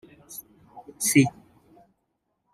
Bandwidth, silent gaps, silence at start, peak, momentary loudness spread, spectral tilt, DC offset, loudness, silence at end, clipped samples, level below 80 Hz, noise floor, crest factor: 15.5 kHz; none; 0.3 s; -6 dBFS; 21 LU; -4.5 dB/octave; under 0.1%; -22 LUFS; 1.25 s; under 0.1%; -70 dBFS; -77 dBFS; 24 dB